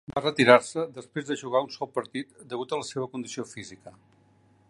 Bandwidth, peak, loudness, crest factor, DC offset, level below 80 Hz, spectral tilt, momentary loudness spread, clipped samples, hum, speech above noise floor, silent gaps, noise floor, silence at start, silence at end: 11.5 kHz; -2 dBFS; -27 LUFS; 26 dB; under 0.1%; -68 dBFS; -4.5 dB/octave; 18 LU; under 0.1%; none; 34 dB; none; -61 dBFS; 0.1 s; 0.8 s